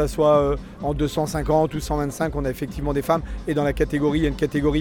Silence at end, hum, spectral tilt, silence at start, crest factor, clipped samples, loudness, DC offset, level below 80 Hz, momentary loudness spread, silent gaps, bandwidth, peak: 0 s; none; -6.5 dB/octave; 0 s; 16 dB; under 0.1%; -23 LUFS; under 0.1%; -32 dBFS; 8 LU; none; 18 kHz; -6 dBFS